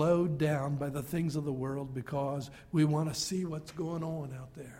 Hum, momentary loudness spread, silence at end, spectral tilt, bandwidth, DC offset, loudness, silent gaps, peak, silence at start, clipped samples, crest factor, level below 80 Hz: none; 10 LU; 0 s; -6.5 dB/octave; 16 kHz; under 0.1%; -34 LUFS; none; -16 dBFS; 0 s; under 0.1%; 16 dB; -60 dBFS